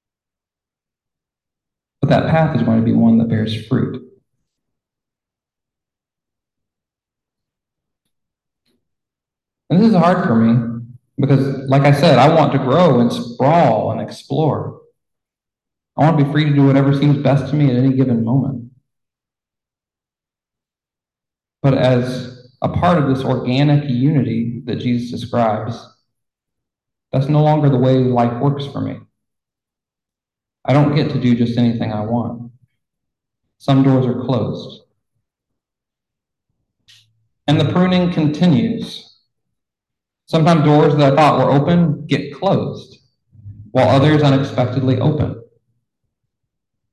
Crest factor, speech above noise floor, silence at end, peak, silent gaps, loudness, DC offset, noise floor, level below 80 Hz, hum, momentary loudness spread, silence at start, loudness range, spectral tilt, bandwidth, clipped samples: 16 dB; 75 dB; 1.5 s; 0 dBFS; none; -15 LUFS; under 0.1%; -89 dBFS; -48 dBFS; none; 13 LU; 2 s; 8 LU; -8.5 dB/octave; 10.5 kHz; under 0.1%